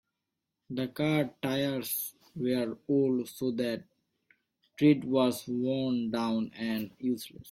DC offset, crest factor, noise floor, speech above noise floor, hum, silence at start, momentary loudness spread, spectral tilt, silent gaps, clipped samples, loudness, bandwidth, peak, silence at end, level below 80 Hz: under 0.1%; 18 dB; -86 dBFS; 56 dB; none; 0.7 s; 9 LU; -5.5 dB/octave; none; under 0.1%; -31 LUFS; 16.5 kHz; -12 dBFS; 0 s; -70 dBFS